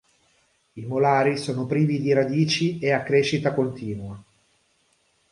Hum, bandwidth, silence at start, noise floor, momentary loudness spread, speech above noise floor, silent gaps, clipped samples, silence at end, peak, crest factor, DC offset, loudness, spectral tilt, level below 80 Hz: none; 11 kHz; 0.75 s; -66 dBFS; 13 LU; 44 dB; none; under 0.1%; 1.1 s; -6 dBFS; 18 dB; under 0.1%; -23 LUFS; -6 dB/octave; -60 dBFS